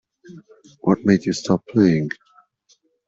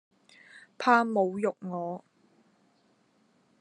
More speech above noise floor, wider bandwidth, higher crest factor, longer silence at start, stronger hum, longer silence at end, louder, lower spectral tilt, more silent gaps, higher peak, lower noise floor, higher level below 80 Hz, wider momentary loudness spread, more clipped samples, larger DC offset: about the same, 42 dB vs 41 dB; second, 7.8 kHz vs 10.5 kHz; second, 18 dB vs 24 dB; second, 0.3 s vs 0.55 s; neither; second, 0.95 s vs 1.6 s; first, -19 LUFS vs -28 LUFS; about the same, -6.5 dB/octave vs -6 dB/octave; neither; first, -2 dBFS vs -8 dBFS; second, -62 dBFS vs -68 dBFS; first, -58 dBFS vs -86 dBFS; second, 10 LU vs 14 LU; neither; neither